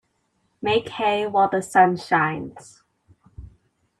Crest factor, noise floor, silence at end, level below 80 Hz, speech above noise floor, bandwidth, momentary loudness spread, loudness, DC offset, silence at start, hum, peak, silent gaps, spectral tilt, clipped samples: 20 dB; -69 dBFS; 0.5 s; -56 dBFS; 49 dB; 12.5 kHz; 11 LU; -21 LUFS; under 0.1%; 0.6 s; none; -2 dBFS; none; -5 dB/octave; under 0.1%